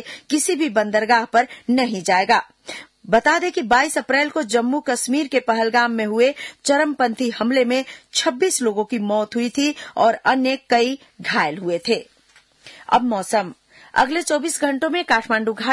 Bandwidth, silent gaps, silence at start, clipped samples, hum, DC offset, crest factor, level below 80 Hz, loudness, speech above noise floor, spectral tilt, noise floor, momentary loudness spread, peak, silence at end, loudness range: 12 kHz; none; 0 s; under 0.1%; none; under 0.1%; 16 dB; -60 dBFS; -19 LUFS; 36 dB; -3 dB/octave; -55 dBFS; 6 LU; -4 dBFS; 0 s; 3 LU